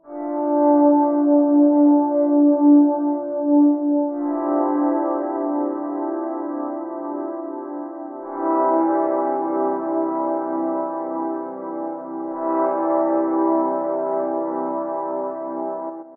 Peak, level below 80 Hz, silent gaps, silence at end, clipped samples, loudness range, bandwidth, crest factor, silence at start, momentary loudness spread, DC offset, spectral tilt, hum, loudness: -6 dBFS; -80 dBFS; none; 0 s; under 0.1%; 8 LU; 2.3 kHz; 14 dB; 0.05 s; 14 LU; under 0.1%; -9.5 dB/octave; none; -20 LUFS